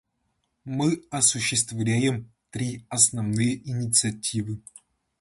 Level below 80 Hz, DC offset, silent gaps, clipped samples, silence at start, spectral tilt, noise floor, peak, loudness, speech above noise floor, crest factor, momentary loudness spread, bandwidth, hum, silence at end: -58 dBFS; under 0.1%; none; under 0.1%; 0.65 s; -3.5 dB/octave; -75 dBFS; -2 dBFS; -24 LUFS; 50 dB; 24 dB; 14 LU; 12 kHz; none; 0.6 s